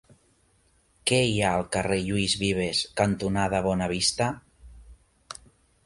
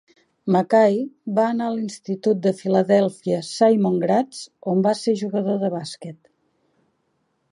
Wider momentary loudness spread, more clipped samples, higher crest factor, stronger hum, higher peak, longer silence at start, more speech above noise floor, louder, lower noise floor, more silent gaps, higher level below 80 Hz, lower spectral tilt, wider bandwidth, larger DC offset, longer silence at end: first, 18 LU vs 13 LU; neither; about the same, 20 dB vs 18 dB; neither; second, -8 dBFS vs -4 dBFS; first, 1.05 s vs 0.45 s; second, 39 dB vs 50 dB; second, -25 LUFS vs -21 LUFS; second, -65 dBFS vs -70 dBFS; neither; first, -48 dBFS vs -72 dBFS; second, -4 dB/octave vs -6.5 dB/octave; about the same, 11.5 kHz vs 11.5 kHz; neither; second, 0.5 s vs 1.4 s